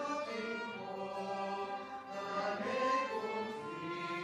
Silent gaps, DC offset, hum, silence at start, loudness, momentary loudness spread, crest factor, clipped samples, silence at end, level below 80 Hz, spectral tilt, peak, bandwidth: none; under 0.1%; none; 0 s; -39 LUFS; 9 LU; 16 dB; under 0.1%; 0 s; -80 dBFS; -4.5 dB/octave; -22 dBFS; 13.5 kHz